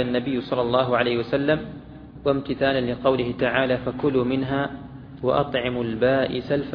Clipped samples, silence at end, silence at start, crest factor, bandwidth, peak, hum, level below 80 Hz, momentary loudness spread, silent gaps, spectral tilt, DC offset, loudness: under 0.1%; 0 s; 0 s; 18 dB; 5.4 kHz; -4 dBFS; none; -48 dBFS; 8 LU; none; -9 dB/octave; under 0.1%; -23 LUFS